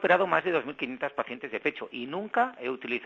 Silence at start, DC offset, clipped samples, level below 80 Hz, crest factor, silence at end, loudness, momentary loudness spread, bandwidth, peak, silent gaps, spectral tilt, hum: 0 s; under 0.1%; under 0.1%; -74 dBFS; 20 dB; 0 s; -30 LUFS; 11 LU; 7.6 kHz; -8 dBFS; none; -6.5 dB/octave; none